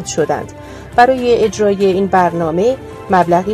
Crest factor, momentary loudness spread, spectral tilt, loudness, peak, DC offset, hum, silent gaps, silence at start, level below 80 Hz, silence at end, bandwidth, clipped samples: 14 dB; 10 LU; -5.5 dB/octave; -14 LUFS; 0 dBFS; under 0.1%; none; none; 0 s; -42 dBFS; 0 s; 13.5 kHz; 0.1%